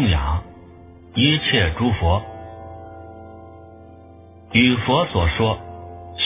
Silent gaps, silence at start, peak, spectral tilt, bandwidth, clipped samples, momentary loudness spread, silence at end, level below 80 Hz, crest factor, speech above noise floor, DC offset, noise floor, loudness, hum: none; 0 s; 0 dBFS; -10 dB/octave; 3.9 kHz; under 0.1%; 23 LU; 0 s; -30 dBFS; 20 dB; 26 dB; under 0.1%; -44 dBFS; -19 LUFS; none